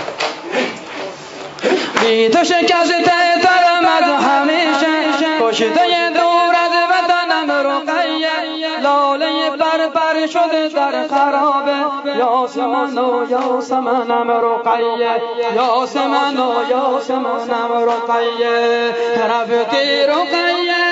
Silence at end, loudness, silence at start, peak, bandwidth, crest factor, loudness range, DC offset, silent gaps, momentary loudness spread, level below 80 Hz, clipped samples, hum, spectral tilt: 0 s; -15 LUFS; 0 s; 0 dBFS; 8 kHz; 14 dB; 4 LU; under 0.1%; none; 6 LU; -68 dBFS; under 0.1%; none; -3 dB/octave